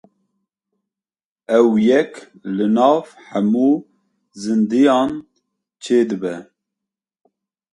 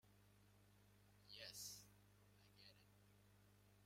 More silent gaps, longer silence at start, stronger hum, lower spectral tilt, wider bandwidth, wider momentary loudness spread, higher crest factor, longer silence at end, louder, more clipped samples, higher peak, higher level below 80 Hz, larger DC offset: neither; first, 1.5 s vs 0.05 s; second, none vs 50 Hz at -75 dBFS; first, -6.5 dB/octave vs -1.5 dB/octave; second, 10.5 kHz vs 16 kHz; about the same, 14 LU vs 14 LU; second, 18 dB vs 24 dB; first, 1.3 s vs 0 s; first, -17 LUFS vs -58 LUFS; neither; first, 0 dBFS vs -42 dBFS; first, -64 dBFS vs -82 dBFS; neither